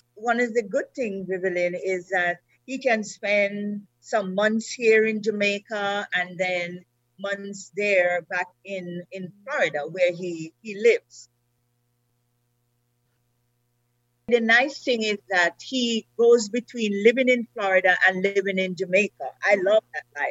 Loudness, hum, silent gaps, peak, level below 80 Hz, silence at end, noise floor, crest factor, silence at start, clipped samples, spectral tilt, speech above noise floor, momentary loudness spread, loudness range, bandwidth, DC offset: -23 LUFS; 60 Hz at -65 dBFS; none; -4 dBFS; -78 dBFS; 0 s; -71 dBFS; 20 dB; 0.15 s; under 0.1%; -4 dB/octave; 47 dB; 14 LU; 6 LU; 8.2 kHz; under 0.1%